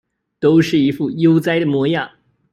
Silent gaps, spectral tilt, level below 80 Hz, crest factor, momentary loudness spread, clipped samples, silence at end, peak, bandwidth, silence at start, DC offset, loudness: none; -7 dB/octave; -56 dBFS; 14 dB; 6 LU; under 0.1%; 0.45 s; -4 dBFS; 13.5 kHz; 0.4 s; under 0.1%; -16 LUFS